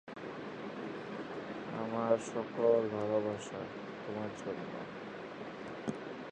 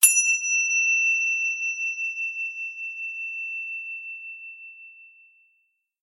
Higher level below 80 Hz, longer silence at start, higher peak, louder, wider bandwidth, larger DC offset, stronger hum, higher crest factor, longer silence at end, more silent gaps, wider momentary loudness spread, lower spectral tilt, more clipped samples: first, -74 dBFS vs under -90 dBFS; about the same, 0.05 s vs 0 s; second, -16 dBFS vs 0 dBFS; second, -38 LUFS vs -23 LUFS; second, 9.4 kHz vs 16 kHz; neither; neither; about the same, 22 dB vs 26 dB; second, 0 s vs 0.95 s; neither; second, 13 LU vs 18 LU; first, -6 dB/octave vs 10 dB/octave; neither